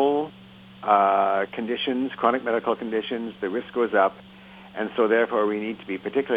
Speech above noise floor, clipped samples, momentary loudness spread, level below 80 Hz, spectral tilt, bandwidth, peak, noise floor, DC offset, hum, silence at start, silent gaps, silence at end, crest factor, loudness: 23 dB; under 0.1%; 11 LU; -66 dBFS; -7.5 dB/octave; 4.9 kHz; -4 dBFS; -47 dBFS; under 0.1%; none; 0 s; none; 0 s; 20 dB; -24 LUFS